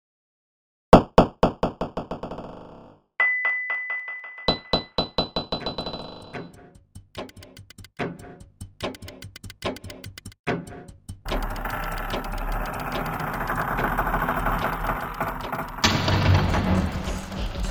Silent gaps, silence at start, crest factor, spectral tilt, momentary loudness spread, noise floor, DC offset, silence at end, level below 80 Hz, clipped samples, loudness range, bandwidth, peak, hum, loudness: 10.39-10.44 s; 0.9 s; 26 dB; -5.5 dB/octave; 21 LU; -49 dBFS; under 0.1%; 0 s; -36 dBFS; under 0.1%; 13 LU; over 20 kHz; 0 dBFS; none; -25 LUFS